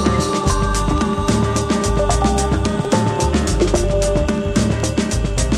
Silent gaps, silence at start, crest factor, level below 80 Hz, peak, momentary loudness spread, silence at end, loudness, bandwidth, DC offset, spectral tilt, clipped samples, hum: none; 0 s; 14 dB; -22 dBFS; -2 dBFS; 2 LU; 0 s; -18 LUFS; 14 kHz; under 0.1%; -5.5 dB/octave; under 0.1%; none